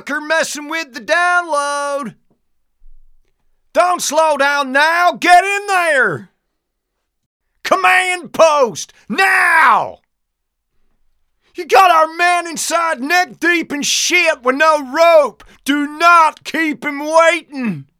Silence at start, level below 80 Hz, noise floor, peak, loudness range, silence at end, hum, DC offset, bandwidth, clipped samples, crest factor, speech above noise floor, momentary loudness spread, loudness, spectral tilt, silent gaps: 0.05 s; -56 dBFS; -72 dBFS; 0 dBFS; 5 LU; 0.15 s; none; under 0.1%; 16.5 kHz; under 0.1%; 16 dB; 58 dB; 12 LU; -13 LUFS; -2 dB/octave; 7.26-7.40 s